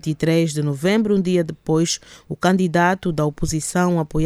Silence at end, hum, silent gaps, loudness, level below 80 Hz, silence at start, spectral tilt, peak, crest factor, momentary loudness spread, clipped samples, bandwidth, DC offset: 0 s; none; none; -20 LUFS; -40 dBFS; 0.05 s; -5.5 dB/octave; -4 dBFS; 16 dB; 5 LU; under 0.1%; 14.5 kHz; under 0.1%